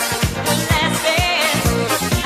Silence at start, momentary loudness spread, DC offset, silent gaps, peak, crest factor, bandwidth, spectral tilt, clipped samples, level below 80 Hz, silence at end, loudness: 0 s; 3 LU; under 0.1%; none; -2 dBFS; 14 dB; 15.5 kHz; -3.5 dB/octave; under 0.1%; -30 dBFS; 0 s; -17 LUFS